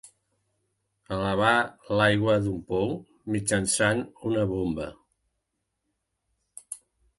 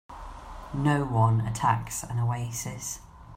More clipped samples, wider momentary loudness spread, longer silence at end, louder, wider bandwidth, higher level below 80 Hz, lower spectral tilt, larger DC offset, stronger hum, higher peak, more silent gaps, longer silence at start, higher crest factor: neither; second, 16 LU vs 19 LU; first, 0.4 s vs 0 s; about the same, -26 LUFS vs -28 LUFS; second, 11.5 kHz vs 16 kHz; about the same, -52 dBFS vs -48 dBFS; about the same, -4.5 dB/octave vs -5.5 dB/octave; neither; neither; first, -6 dBFS vs -10 dBFS; neither; about the same, 0.05 s vs 0.1 s; about the same, 22 dB vs 18 dB